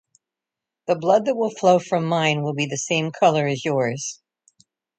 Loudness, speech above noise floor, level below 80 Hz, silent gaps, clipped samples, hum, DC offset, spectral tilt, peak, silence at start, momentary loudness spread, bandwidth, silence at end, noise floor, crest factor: -21 LUFS; 66 dB; -68 dBFS; none; under 0.1%; none; under 0.1%; -4.5 dB/octave; -2 dBFS; 0.9 s; 7 LU; 9.2 kHz; 0.85 s; -87 dBFS; 20 dB